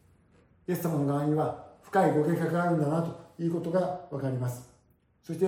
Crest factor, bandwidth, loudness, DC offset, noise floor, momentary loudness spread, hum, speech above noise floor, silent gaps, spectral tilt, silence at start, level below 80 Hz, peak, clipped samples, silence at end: 18 dB; 16.5 kHz; -29 LUFS; under 0.1%; -66 dBFS; 11 LU; none; 38 dB; none; -8 dB/octave; 0.7 s; -68 dBFS; -12 dBFS; under 0.1%; 0 s